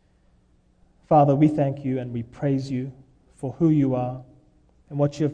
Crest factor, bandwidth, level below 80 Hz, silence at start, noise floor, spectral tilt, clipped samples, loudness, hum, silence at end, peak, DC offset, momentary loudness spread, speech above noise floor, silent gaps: 18 dB; 9.4 kHz; -56 dBFS; 1.1 s; -60 dBFS; -9.5 dB/octave; under 0.1%; -23 LUFS; none; 0 s; -6 dBFS; under 0.1%; 16 LU; 38 dB; none